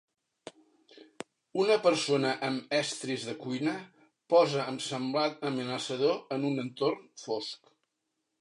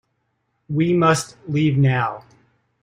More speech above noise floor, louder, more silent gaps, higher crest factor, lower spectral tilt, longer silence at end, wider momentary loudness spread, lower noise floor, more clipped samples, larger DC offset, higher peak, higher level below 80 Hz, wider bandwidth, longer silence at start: about the same, 53 dB vs 52 dB; second, -30 LUFS vs -19 LUFS; neither; about the same, 20 dB vs 16 dB; second, -4.5 dB/octave vs -6.5 dB/octave; first, 0.85 s vs 0.65 s; first, 22 LU vs 10 LU; first, -83 dBFS vs -71 dBFS; neither; neither; second, -12 dBFS vs -4 dBFS; second, -84 dBFS vs -56 dBFS; second, 11 kHz vs 15 kHz; second, 0.45 s vs 0.7 s